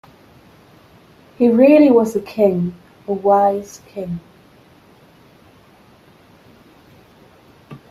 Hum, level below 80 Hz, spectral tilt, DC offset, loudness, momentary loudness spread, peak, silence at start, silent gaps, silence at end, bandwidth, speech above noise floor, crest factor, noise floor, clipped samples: none; -58 dBFS; -7.5 dB/octave; under 0.1%; -15 LUFS; 20 LU; 0 dBFS; 1.4 s; none; 0.15 s; 13.5 kHz; 34 dB; 18 dB; -49 dBFS; under 0.1%